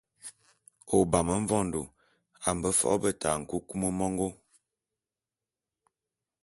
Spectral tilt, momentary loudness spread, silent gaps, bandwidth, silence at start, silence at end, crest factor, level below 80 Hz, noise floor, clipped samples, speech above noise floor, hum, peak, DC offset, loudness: -5 dB/octave; 14 LU; none; 12 kHz; 0.25 s; 2.1 s; 24 dB; -52 dBFS; under -90 dBFS; under 0.1%; over 62 dB; none; -8 dBFS; under 0.1%; -29 LUFS